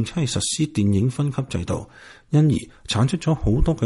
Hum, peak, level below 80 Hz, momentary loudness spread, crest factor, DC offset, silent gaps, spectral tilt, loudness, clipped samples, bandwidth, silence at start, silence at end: none; -6 dBFS; -32 dBFS; 8 LU; 16 dB; under 0.1%; none; -6 dB/octave; -22 LUFS; under 0.1%; 11.5 kHz; 0 s; 0 s